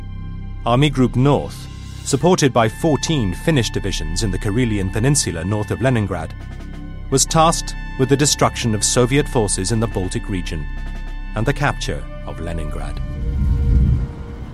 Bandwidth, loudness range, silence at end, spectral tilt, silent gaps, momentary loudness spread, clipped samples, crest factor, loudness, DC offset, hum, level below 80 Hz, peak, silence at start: 14 kHz; 6 LU; 0 s; -4.5 dB/octave; none; 16 LU; under 0.1%; 16 dB; -19 LUFS; under 0.1%; none; -26 dBFS; -2 dBFS; 0 s